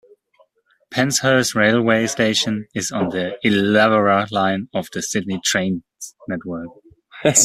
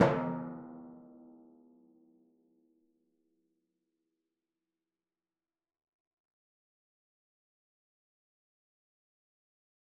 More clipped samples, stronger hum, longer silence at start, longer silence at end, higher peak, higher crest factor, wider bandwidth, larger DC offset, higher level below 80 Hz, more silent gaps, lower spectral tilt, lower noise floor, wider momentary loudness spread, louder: neither; neither; first, 0.9 s vs 0 s; second, 0 s vs 9 s; first, 0 dBFS vs -10 dBFS; second, 20 dB vs 32 dB; first, 15 kHz vs 3.1 kHz; neither; first, -58 dBFS vs -76 dBFS; neither; about the same, -3.5 dB/octave vs -4.5 dB/octave; second, -60 dBFS vs under -90 dBFS; second, 14 LU vs 25 LU; first, -18 LUFS vs -36 LUFS